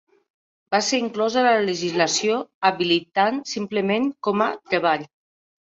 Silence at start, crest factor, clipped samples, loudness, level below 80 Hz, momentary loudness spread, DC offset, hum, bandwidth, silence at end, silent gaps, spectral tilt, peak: 0.7 s; 18 dB; under 0.1%; -22 LUFS; -68 dBFS; 5 LU; under 0.1%; none; 8 kHz; 0.6 s; 2.54-2.61 s; -3.5 dB/octave; -4 dBFS